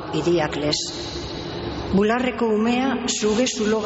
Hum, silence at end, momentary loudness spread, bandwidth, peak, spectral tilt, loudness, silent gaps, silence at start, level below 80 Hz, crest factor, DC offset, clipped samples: none; 0 s; 10 LU; 8 kHz; -8 dBFS; -4 dB/octave; -22 LUFS; none; 0 s; -42 dBFS; 14 dB; under 0.1%; under 0.1%